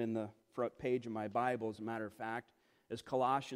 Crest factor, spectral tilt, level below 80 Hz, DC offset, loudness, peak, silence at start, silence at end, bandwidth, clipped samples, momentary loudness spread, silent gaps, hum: 16 dB; -6.5 dB/octave; -76 dBFS; under 0.1%; -40 LUFS; -22 dBFS; 0 s; 0 s; 15.5 kHz; under 0.1%; 11 LU; none; none